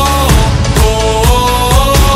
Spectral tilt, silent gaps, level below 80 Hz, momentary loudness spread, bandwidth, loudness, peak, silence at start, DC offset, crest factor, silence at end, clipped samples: -4.5 dB/octave; none; -12 dBFS; 2 LU; 16.5 kHz; -10 LUFS; 0 dBFS; 0 s; under 0.1%; 8 dB; 0 s; 1%